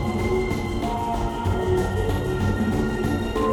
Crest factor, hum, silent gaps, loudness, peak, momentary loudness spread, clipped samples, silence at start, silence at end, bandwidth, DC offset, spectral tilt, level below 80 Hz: 14 dB; none; none; -24 LUFS; -10 dBFS; 3 LU; under 0.1%; 0 s; 0 s; 18.5 kHz; under 0.1%; -7 dB/octave; -32 dBFS